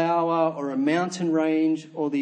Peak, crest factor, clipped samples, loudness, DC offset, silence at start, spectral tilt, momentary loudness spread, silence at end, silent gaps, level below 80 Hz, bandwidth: -10 dBFS; 14 dB; under 0.1%; -24 LUFS; under 0.1%; 0 s; -6 dB/octave; 4 LU; 0 s; none; -80 dBFS; 9.2 kHz